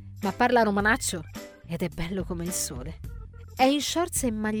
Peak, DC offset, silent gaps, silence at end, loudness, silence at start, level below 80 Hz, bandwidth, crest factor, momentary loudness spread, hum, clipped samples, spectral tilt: -8 dBFS; under 0.1%; none; 0 s; -26 LUFS; 0 s; -44 dBFS; 19.5 kHz; 18 dB; 20 LU; none; under 0.1%; -4 dB/octave